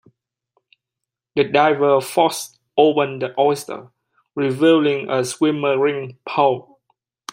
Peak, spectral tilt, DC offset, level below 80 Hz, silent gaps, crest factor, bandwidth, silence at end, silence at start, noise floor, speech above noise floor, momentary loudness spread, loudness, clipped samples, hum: -2 dBFS; -5 dB/octave; under 0.1%; -68 dBFS; none; 18 dB; 16 kHz; 0.7 s; 1.35 s; -84 dBFS; 66 dB; 13 LU; -18 LUFS; under 0.1%; none